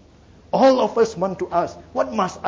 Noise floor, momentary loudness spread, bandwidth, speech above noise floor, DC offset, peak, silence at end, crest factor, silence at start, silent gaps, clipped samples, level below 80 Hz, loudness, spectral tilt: -49 dBFS; 10 LU; 7.6 kHz; 29 dB; under 0.1%; -6 dBFS; 0 s; 14 dB; 0.55 s; none; under 0.1%; -52 dBFS; -20 LUFS; -5.5 dB/octave